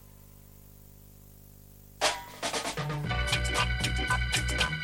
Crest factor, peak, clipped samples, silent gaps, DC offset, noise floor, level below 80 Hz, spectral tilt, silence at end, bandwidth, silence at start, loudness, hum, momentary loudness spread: 20 dB; -12 dBFS; under 0.1%; none; under 0.1%; -52 dBFS; -38 dBFS; -3 dB/octave; 0 s; 17 kHz; 0.05 s; -29 LUFS; 50 Hz at -55 dBFS; 6 LU